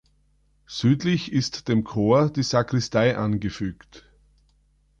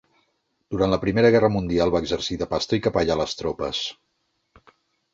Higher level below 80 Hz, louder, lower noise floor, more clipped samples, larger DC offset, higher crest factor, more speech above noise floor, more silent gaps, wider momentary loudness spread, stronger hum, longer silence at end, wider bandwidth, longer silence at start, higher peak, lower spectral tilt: about the same, -50 dBFS vs -46 dBFS; about the same, -23 LUFS vs -22 LUFS; second, -63 dBFS vs -73 dBFS; neither; neither; about the same, 16 dB vs 20 dB; second, 41 dB vs 51 dB; neither; about the same, 9 LU vs 10 LU; first, 50 Hz at -45 dBFS vs none; second, 1 s vs 1.2 s; first, 8.8 kHz vs 7.8 kHz; about the same, 0.7 s vs 0.7 s; second, -8 dBFS vs -4 dBFS; about the same, -6 dB/octave vs -5.5 dB/octave